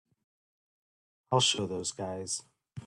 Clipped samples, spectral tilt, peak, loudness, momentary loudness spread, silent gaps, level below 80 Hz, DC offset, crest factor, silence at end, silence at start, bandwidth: under 0.1%; -3 dB/octave; -12 dBFS; -31 LUFS; 12 LU; none; -70 dBFS; under 0.1%; 22 dB; 0 s; 1.3 s; 12 kHz